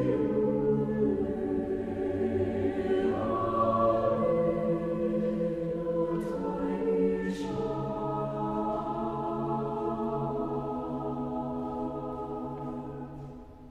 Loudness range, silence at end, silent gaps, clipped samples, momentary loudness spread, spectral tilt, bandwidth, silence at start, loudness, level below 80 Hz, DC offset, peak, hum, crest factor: 5 LU; 0 s; none; under 0.1%; 9 LU; -9 dB/octave; 11.5 kHz; 0 s; -31 LUFS; -52 dBFS; under 0.1%; -14 dBFS; none; 16 dB